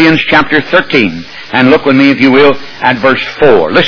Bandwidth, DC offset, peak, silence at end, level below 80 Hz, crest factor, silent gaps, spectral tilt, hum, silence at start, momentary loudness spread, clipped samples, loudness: 5.4 kHz; 4%; 0 dBFS; 0 s; -40 dBFS; 8 dB; none; -6.5 dB/octave; none; 0 s; 7 LU; 3%; -8 LUFS